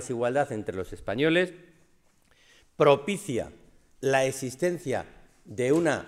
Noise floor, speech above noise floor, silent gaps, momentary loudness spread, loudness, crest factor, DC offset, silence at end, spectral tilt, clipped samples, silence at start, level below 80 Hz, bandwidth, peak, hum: -62 dBFS; 36 dB; none; 12 LU; -27 LUFS; 22 dB; under 0.1%; 0 s; -5 dB/octave; under 0.1%; 0 s; -58 dBFS; 15.5 kHz; -6 dBFS; none